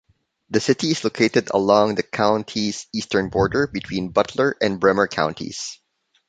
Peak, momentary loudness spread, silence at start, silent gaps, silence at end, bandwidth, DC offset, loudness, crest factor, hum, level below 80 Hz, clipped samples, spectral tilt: -2 dBFS; 8 LU; 0.5 s; none; 0.55 s; 9.4 kHz; under 0.1%; -21 LUFS; 20 dB; none; -50 dBFS; under 0.1%; -4.5 dB/octave